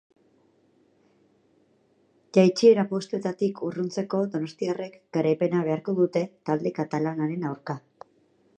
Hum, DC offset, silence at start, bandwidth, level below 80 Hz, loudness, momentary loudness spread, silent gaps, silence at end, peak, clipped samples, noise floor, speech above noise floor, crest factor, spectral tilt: none; under 0.1%; 2.35 s; 9.4 kHz; -76 dBFS; -25 LUFS; 12 LU; none; 0.8 s; -6 dBFS; under 0.1%; -65 dBFS; 40 dB; 22 dB; -7 dB/octave